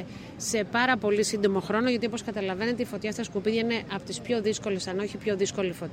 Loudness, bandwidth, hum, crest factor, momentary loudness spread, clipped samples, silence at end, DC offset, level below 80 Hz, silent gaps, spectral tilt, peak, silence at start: -28 LUFS; 16 kHz; none; 18 dB; 7 LU; under 0.1%; 0 s; under 0.1%; -60 dBFS; none; -4 dB/octave; -10 dBFS; 0 s